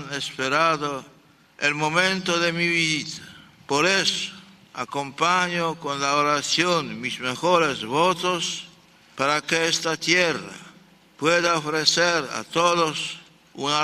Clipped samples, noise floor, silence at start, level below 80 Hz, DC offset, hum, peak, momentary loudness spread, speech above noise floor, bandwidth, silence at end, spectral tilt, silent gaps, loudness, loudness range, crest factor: under 0.1%; -52 dBFS; 0 s; -64 dBFS; under 0.1%; none; -4 dBFS; 11 LU; 30 dB; 14.5 kHz; 0 s; -3 dB/octave; none; -22 LUFS; 2 LU; 20 dB